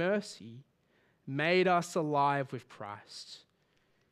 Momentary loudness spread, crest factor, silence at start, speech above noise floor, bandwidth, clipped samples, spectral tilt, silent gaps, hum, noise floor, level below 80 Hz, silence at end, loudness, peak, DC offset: 22 LU; 18 dB; 0 s; 40 dB; 14 kHz; under 0.1%; -5.5 dB/octave; none; none; -73 dBFS; -82 dBFS; 0.75 s; -31 LUFS; -16 dBFS; under 0.1%